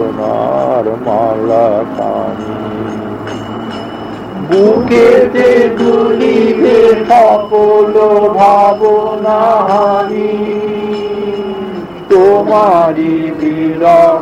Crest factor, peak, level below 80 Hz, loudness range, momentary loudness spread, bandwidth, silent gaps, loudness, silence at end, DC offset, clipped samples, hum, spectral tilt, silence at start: 10 dB; 0 dBFS; -46 dBFS; 7 LU; 14 LU; 10 kHz; none; -10 LUFS; 0 s; under 0.1%; 0.1%; none; -7 dB/octave; 0 s